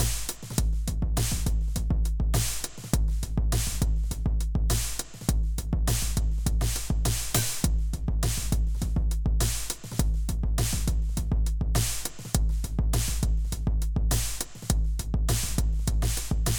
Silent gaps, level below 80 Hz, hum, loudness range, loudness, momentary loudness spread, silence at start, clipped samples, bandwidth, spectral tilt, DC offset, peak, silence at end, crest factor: none; -28 dBFS; none; 1 LU; -28 LUFS; 3 LU; 0 s; under 0.1%; over 20 kHz; -4 dB/octave; under 0.1%; -8 dBFS; 0 s; 18 dB